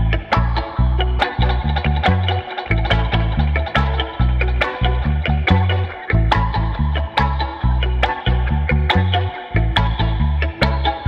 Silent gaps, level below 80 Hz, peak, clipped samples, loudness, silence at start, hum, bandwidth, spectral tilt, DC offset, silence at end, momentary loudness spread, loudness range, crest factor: none; -20 dBFS; 0 dBFS; under 0.1%; -18 LUFS; 0 s; none; 6.2 kHz; -7.5 dB/octave; under 0.1%; 0 s; 4 LU; 1 LU; 16 dB